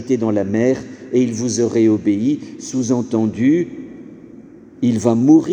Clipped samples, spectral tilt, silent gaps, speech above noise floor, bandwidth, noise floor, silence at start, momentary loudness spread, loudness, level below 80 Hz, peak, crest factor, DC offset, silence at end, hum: under 0.1%; -6.5 dB/octave; none; 24 dB; 9.6 kHz; -40 dBFS; 0 s; 10 LU; -17 LUFS; -58 dBFS; 0 dBFS; 16 dB; under 0.1%; 0 s; none